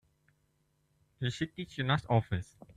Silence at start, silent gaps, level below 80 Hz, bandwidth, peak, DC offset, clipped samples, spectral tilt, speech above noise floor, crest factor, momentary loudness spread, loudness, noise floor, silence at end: 1.2 s; none; -60 dBFS; 10 kHz; -14 dBFS; under 0.1%; under 0.1%; -6.5 dB/octave; 42 dB; 22 dB; 9 LU; -34 LUFS; -75 dBFS; 0.35 s